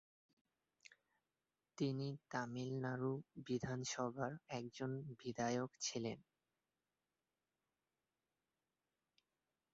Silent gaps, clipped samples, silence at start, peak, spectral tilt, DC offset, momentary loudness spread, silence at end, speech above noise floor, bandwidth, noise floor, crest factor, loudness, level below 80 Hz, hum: none; under 0.1%; 1.8 s; -26 dBFS; -5.5 dB/octave; under 0.1%; 7 LU; 3.5 s; over 46 dB; 7.6 kHz; under -90 dBFS; 22 dB; -45 LUFS; -78 dBFS; none